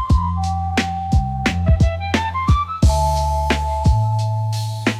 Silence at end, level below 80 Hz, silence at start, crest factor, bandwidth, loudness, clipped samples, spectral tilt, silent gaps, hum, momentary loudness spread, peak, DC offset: 0 s; -24 dBFS; 0 s; 12 dB; 13.5 kHz; -19 LUFS; under 0.1%; -6 dB/octave; none; none; 5 LU; -6 dBFS; under 0.1%